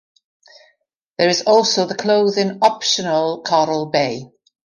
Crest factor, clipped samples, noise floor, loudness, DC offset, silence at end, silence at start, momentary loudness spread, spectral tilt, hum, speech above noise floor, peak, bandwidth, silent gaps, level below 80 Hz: 18 dB; under 0.1%; -65 dBFS; -17 LUFS; under 0.1%; 0.5 s; 1.2 s; 6 LU; -3.5 dB/octave; none; 48 dB; -2 dBFS; 11 kHz; none; -64 dBFS